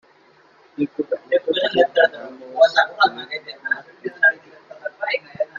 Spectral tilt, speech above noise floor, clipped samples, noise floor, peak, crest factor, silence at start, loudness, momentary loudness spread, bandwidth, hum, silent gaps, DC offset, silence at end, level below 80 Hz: -4 dB/octave; 34 dB; under 0.1%; -54 dBFS; 0 dBFS; 20 dB; 0.8 s; -20 LUFS; 18 LU; 7.4 kHz; none; none; under 0.1%; 0 s; -70 dBFS